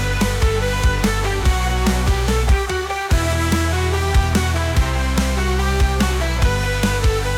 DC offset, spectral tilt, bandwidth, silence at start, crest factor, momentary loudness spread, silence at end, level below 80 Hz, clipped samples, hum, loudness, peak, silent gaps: under 0.1%; -5 dB/octave; 16.5 kHz; 0 s; 12 dB; 1 LU; 0 s; -20 dBFS; under 0.1%; none; -19 LUFS; -6 dBFS; none